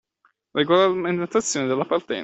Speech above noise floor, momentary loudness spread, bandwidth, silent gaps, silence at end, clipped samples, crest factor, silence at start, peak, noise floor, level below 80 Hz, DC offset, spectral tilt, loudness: 45 dB; 7 LU; 8.4 kHz; none; 0 s; under 0.1%; 18 dB; 0.55 s; -4 dBFS; -66 dBFS; -64 dBFS; under 0.1%; -4 dB/octave; -22 LUFS